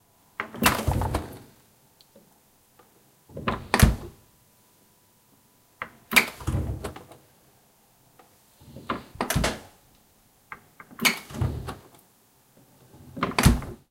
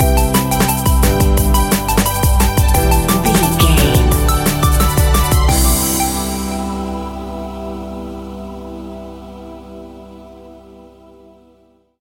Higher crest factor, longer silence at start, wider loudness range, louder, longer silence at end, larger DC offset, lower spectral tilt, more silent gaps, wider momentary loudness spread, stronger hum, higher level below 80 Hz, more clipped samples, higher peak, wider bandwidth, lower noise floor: first, 28 dB vs 14 dB; first, 0.4 s vs 0 s; second, 7 LU vs 19 LU; second, -26 LUFS vs -14 LUFS; second, 0.15 s vs 1.4 s; neither; about the same, -4 dB/octave vs -4.5 dB/octave; neither; first, 24 LU vs 18 LU; neither; second, -36 dBFS vs -18 dBFS; neither; about the same, 0 dBFS vs 0 dBFS; about the same, 17 kHz vs 17 kHz; first, -61 dBFS vs -53 dBFS